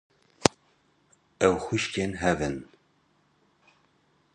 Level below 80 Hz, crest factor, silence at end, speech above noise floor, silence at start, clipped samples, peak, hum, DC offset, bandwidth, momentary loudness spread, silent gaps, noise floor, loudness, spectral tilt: -52 dBFS; 30 dB; 1.7 s; 41 dB; 0.4 s; under 0.1%; 0 dBFS; none; under 0.1%; 11.5 kHz; 6 LU; none; -67 dBFS; -27 LUFS; -4.5 dB/octave